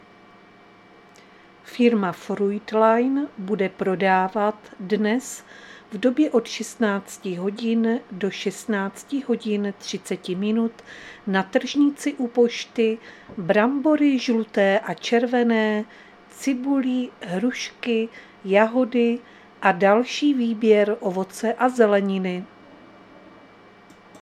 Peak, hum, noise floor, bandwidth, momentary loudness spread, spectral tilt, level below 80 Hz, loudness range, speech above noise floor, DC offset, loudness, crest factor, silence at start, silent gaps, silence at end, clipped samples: -2 dBFS; none; -50 dBFS; 13.5 kHz; 12 LU; -5.5 dB/octave; -70 dBFS; 5 LU; 28 dB; under 0.1%; -22 LUFS; 20 dB; 1.65 s; none; 0.9 s; under 0.1%